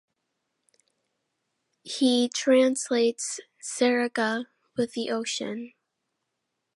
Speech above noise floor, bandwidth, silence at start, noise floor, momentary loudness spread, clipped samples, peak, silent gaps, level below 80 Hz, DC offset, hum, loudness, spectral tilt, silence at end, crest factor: 56 dB; 11.5 kHz; 1.85 s; -81 dBFS; 14 LU; under 0.1%; -10 dBFS; none; -80 dBFS; under 0.1%; none; -26 LUFS; -2.5 dB/octave; 1.1 s; 18 dB